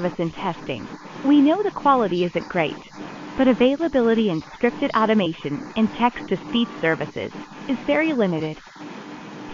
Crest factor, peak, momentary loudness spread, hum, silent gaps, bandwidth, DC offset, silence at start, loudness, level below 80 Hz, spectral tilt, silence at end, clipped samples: 18 dB; -4 dBFS; 18 LU; none; none; 7.6 kHz; under 0.1%; 0 s; -22 LUFS; -54 dBFS; -7 dB/octave; 0 s; under 0.1%